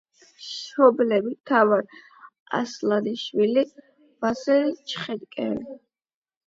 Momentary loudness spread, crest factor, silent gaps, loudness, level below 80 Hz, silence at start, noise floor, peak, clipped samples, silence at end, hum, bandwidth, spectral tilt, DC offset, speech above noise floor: 14 LU; 20 dB; 2.39-2.46 s; -24 LUFS; -70 dBFS; 0.4 s; -42 dBFS; -4 dBFS; under 0.1%; 0.7 s; none; 7.8 kHz; -5 dB/octave; under 0.1%; 19 dB